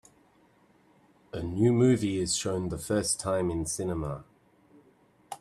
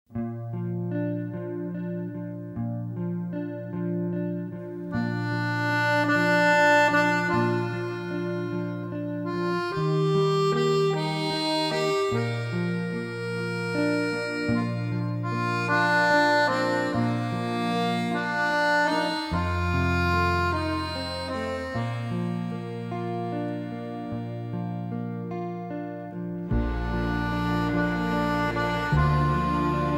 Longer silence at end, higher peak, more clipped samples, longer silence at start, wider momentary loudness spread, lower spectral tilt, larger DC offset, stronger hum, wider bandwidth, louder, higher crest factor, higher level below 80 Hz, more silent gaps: about the same, 0.05 s vs 0 s; about the same, -12 dBFS vs -10 dBFS; neither; first, 1.35 s vs 0.1 s; first, 14 LU vs 11 LU; second, -5 dB/octave vs -6.5 dB/octave; neither; neither; second, 14 kHz vs 16 kHz; about the same, -28 LUFS vs -26 LUFS; about the same, 18 dB vs 16 dB; second, -54 dBFS vs -42 dBFS; neither